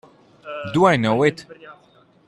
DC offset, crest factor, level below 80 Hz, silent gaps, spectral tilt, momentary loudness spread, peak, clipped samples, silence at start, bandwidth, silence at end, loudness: under 0.1%; 18 dB; -58 dBFS; none; -6.5 dB/octave; 18 LU; -2 dBFS; under 0.1%; 0.45 s; 11.5 kHz; 0.55 s; -18 LUFS